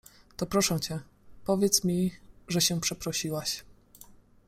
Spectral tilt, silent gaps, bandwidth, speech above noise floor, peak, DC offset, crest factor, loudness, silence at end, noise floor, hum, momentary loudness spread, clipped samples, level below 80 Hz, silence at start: -3.5 dB/octave; none; 16 kHz; 26 dB; -8 dBFS; under 0.1%; 22 dB; -28 LUFS; 0.3 s; -54 dBFS; none; 13 LU; under 0.1%; -56 dBFS; 0.4 s